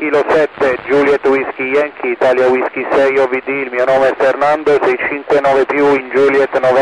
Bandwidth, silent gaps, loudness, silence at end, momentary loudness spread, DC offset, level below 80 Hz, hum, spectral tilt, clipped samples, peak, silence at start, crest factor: 10.5 kHz; none; -13 LUFS; 0 s; 4 LU; under 0.1%; -50 dBFS; none; -5.5 dB/octave; under 0.1%; -4 dBFS; 0 s; 10 dB